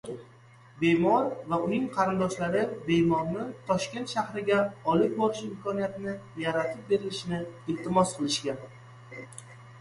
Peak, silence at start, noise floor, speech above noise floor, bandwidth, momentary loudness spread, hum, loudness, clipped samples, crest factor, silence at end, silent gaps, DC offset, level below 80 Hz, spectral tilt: -10 dBFS; 0.05 s; -54 dBFS; 26 dB; 11.5 kHz; 16 LU; none; -28 LUFS; under 0.1%; 18 dB; 0 s; none; under 0.1%; -60 dBFS; -5.5 dB/octave